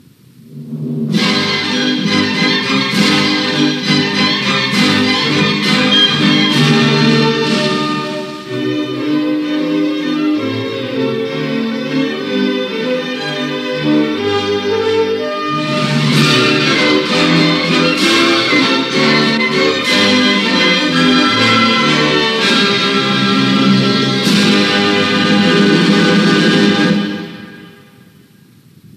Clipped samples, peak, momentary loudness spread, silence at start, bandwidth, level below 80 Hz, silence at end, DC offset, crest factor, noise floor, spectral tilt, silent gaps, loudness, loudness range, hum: under 0.1%; 0 dBFS; 8 LU; 0.5 s; 14 kHz; -56 dBFS; 0.1 s; under 0.1%; 14 dB; -44 dBFS; -4.5 dB/octave; none; -12 LUFS; 6 LU; none